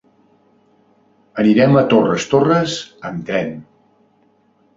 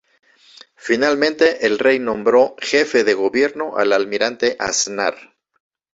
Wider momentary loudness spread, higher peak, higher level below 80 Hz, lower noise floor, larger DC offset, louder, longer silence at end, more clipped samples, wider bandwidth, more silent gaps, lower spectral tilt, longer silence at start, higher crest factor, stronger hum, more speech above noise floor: first, 16 LU vs 5 LU; about the same, 0 dBFS vs 0 dBFS; about the same, -56 dBFS vs -58 dBFS; first, -57 dBFS vs -47 dBFS; neither; about the same, -16 LUFS vs -17 LUFS; first, 1.15 s vs 0.8 s; neither; about the same, 7.8 kHz vs 8 kHz; neither; first, -6 dB/octave vs -2.5 dB/octave; first, 1.35 s vs 0.85 s; about the same, 18 dB vs 18 dB; neither; first, 42 dB vs 30 dB